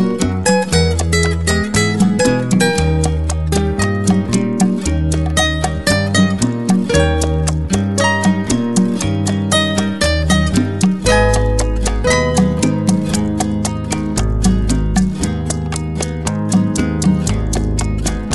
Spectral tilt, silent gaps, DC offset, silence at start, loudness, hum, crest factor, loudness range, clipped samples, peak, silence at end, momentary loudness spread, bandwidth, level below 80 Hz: -5 dB/octave; none; 1%; 0 s; -15 LUFS; none; 12 dB; 3 LU; under 0.1%; -2 dBFS; 0 s; 5 LU; 12 kHz; -24 dBFS